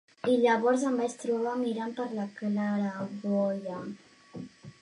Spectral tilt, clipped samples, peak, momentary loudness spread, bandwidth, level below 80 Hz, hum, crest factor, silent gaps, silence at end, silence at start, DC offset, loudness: -6 dB/octave; under 0.1%; -12 dBFS; 20 LU; 11 kHz; -76 dBFS; none; 18 dB; none; 0.1 s; 0.25 s; under 0.1%; -30 LUFS